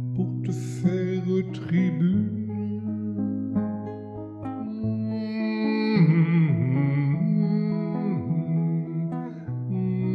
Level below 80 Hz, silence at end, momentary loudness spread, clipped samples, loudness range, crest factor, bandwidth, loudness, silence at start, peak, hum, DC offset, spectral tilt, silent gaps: -60 dBFS; 0 s; 11 LU; under 0.1%; 6 LU; 14 dB; 8 kHz; -26 LUFS; 0 s; -10 dBFS; none; under 0.1%; -9 dB/octave; none